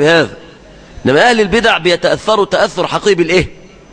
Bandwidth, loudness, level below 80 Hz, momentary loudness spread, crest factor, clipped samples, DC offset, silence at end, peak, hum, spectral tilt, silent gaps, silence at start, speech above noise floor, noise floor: 10 kHz; -12 LUFS; -36 dBFS; 5 LU; 12 dB; under 0.1%; under 0.1%; 0.4 s; 0 dBFS; none; -4.5 dB/octave; none; 0 s; 26 dB; -37 dBFS